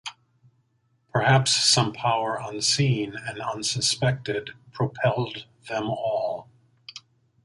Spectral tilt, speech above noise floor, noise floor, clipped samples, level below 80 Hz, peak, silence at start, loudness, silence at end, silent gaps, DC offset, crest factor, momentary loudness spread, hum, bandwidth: -3.5 dB/octave; 44 dB; -68 dBFS; under 0.1%; -60 dBFS; -8 dBFS; 0.05 s; -24 LUFS; 0.45 s; none; under 0.1%; 18 dB; 20 LU; none; 11.5 kHz